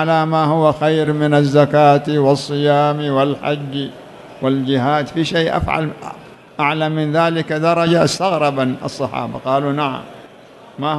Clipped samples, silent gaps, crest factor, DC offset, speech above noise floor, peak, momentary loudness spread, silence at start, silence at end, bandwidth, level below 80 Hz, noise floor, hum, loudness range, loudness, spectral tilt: under 0.1%; none; 16 dB; under 0.1%; 26 dB; 0 dBFS; 10 LU; 0 s; 0 s; 12 kHz; -46 dBFS; -41 dBFS; none; 5 LU; -16 LUFS; -6.5 dB/octave